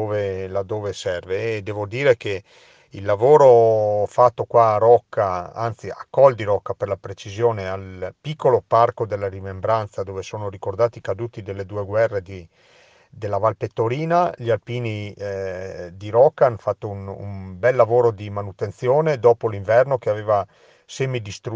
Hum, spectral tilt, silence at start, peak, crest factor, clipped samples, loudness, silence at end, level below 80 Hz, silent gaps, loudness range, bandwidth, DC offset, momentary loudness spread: none; -7 dB/octave; 0 s; 0 dBFS; 20 dB; under 0.1%; -20 LUFS; 0 s; -60 dBFS; none; 8 LU; 7.8 kHz; under 0.1%; 15 LU